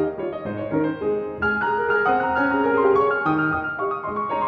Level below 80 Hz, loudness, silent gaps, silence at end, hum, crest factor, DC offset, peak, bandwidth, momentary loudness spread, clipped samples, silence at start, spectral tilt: -52 dBFS; -22 LUFS; none; 0 s; none; 14 dB; under 0.1%; -8 dBFS; 5.4 kHz; 8 LU; under 0.1%; 0 s; -8.5 dB/octave